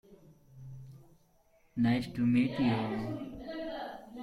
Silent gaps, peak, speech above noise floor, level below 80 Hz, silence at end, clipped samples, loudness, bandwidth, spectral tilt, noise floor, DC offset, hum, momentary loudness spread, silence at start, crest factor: none; -18 dBFS; 37 dB; -62 dBFS; 0 s; under 0.1%; -33 LUFS; 11.5 kHz; -8 dB/octave; -67 dBFS; under 0.1%; none; 22 LU; 0.1 s; 16 dB